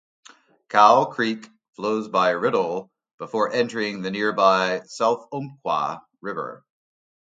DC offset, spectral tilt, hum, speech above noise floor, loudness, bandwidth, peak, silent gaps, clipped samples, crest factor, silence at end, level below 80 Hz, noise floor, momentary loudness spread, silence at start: under 0.1%; -4.5 dB/octave; none; 29 dB; -22 LUFS; 9.2 kHz; 0 dBFS; 1.69-1.73 s, 3.14-3.18 s; under 0.1%; 22 dB; 0.7 s; -72 dBFS; -50 dBFS; 16 LU; 0.7 s